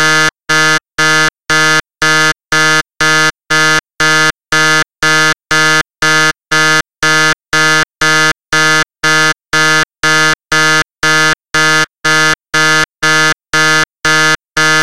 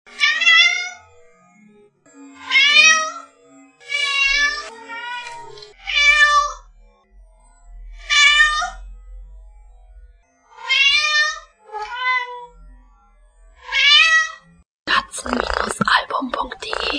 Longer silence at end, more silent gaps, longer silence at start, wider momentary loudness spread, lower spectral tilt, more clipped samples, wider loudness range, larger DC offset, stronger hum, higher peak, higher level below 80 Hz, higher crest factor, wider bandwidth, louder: about the same, 0 s vs 0 s; second, none vs 14.65-14.86 s; second, 0 s vs 0.15 s; second, 2 LU vs 21 LU; first, -2 dB/octave vs 0 dB/octave; neither; second, 0 LU vs 4 LU; first, 3% vs under 0.1%; neither; about the same, 0 dBFS vs 0 dBFS; about the same, -44 dBFS vs -44 dBFS; second, 10 dB vs 20 dB; first, 16 kHz vs 10.5 kHz; first, -10 LUFS vs -14 LUFS